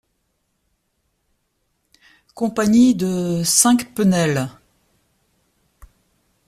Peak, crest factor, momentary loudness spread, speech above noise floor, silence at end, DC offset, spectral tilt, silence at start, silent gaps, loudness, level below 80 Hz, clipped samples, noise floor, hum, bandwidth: 0 dBFS; 22 dB; 10 LU; 54 dB; 1.95 s; under 0.1%; -4.5 dB/octave; 2.35 s; none; -17 LUFS; -54 dBFS; under 0.1%; -70 dBFS; none; 15.5 kHz